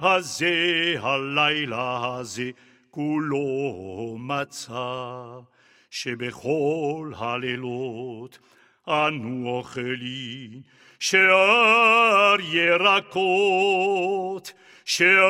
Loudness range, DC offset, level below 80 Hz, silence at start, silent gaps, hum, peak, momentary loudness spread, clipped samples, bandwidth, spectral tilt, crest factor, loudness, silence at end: 12 LU; under 0.1%; -68 dBFS; 0 s; none; none; -4 dBFS; 18 LU; under 0.1%; 15.5 kHz; -3.5 dB/octave; 18 dB; -22 LUFS; 0 s